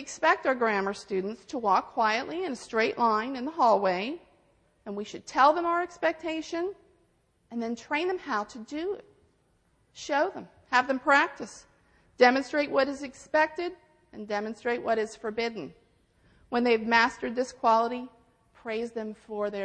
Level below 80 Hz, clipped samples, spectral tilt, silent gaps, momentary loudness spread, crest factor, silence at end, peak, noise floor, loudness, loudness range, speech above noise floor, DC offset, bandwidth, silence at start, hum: -66 dBFS; under 0.1%; -4 dB/octave; none; 15 LU; 22 dB; 0 s; -6 dBFS; -68 dBFS; -28 LUFS; 6 LU; 41 dB; under 0.1%; 10 kHz; 0 s; none